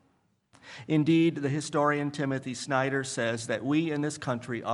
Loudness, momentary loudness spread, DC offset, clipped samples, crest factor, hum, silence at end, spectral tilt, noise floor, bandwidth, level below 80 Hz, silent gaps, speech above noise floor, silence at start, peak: -28 LUFS; 8 LU; under 0.1%; under 0.1%; 18 dB; none; 0 s; -5.5 dB/octave; -70 dBFS; 11.5 kHz; -72 dBFS; none; 42 dB; 0.65 s; -12 dBFS